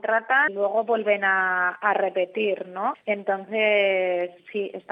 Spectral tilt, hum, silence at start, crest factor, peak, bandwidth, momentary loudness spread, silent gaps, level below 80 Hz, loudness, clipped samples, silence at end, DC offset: -7 dB/octave; none; 0.05 s; 16 dB; -6 dBFS; 5.2 kHz; 9 LU; none; -84 dBFS; -23 LUFS; under 0.1%; 0.1 s; under 0.1%